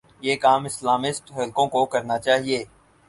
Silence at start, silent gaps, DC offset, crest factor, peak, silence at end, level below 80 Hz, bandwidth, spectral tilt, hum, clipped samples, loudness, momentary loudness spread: 0.2 s; none; under 0.1%; 18 dB; -4 dBFS; 0.45 s; -62 dBFS; 11.5 kHz; -3.5 dB/octave; none; under 0.1%; -22 LUFS; 8 LU